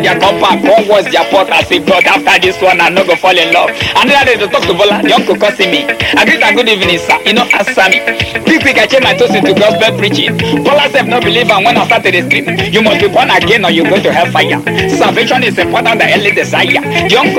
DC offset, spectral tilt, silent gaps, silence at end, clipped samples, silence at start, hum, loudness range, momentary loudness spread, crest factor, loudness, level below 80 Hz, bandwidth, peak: under 0.1%; -4 dB/octave; none; 0 s; 1%; 0 s; none; 1 LU; 3 LU; 8 dB; -8 LUFS; -42 dBFS; 17 kHz; 0 dBFS